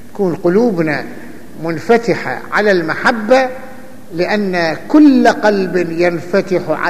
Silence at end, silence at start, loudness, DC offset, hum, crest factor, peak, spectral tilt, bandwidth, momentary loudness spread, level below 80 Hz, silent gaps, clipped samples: 0 s; 0.15 s; -13 LUFS; 3%; none; 14 dB; 0 dBFS; -6 dB/octave; 14.5 kHz; 15 LU; -52 dBFS; none; under 0.1%